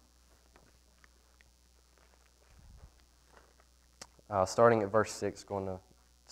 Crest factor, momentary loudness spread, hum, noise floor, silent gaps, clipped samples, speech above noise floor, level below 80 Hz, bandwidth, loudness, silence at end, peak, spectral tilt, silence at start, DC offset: 26 dB; 28 LU; 60 Hz at -65 dBFS; -65 dBFS; none; under 0.1%; 35 dB; -64 dBFS; 15 kHz; -31 LUFS; 0.5 s; -10 dBFS; -5.5 dB/octave; 2.85 s; under 0.1%